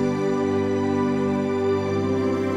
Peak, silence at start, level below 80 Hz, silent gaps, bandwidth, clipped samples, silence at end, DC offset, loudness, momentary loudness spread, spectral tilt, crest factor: -12 dBFS; 0 s; -62 dBFS; none; 10 kHz; under 0.1%; 0 s; under 0.1%; -23 LUFS; 1 LU; -7.5 dB/octave; 10 dB